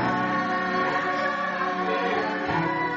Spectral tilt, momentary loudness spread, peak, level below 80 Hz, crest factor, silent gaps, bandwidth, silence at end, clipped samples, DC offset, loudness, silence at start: -3.5 dB/octave; 2 LU; -12 dBFS; -58 dBFS; 14 dB; none; 7.6 kHz; 0 s; under 0.1%; under 0.1%; -25 LUFS; 0 s